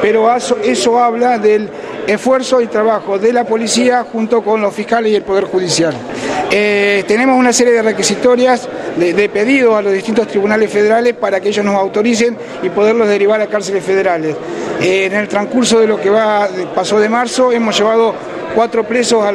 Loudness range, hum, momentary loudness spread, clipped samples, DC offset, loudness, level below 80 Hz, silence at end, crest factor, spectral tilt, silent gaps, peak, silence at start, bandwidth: 2 LU; none; 6 LU; under 0.1%; under 0.1%; -12 LUFS; -54 dBFS; 0 s; 12 dB; -3.5 dB/octave; none; 0 dBFS; 0 s; 13 kHz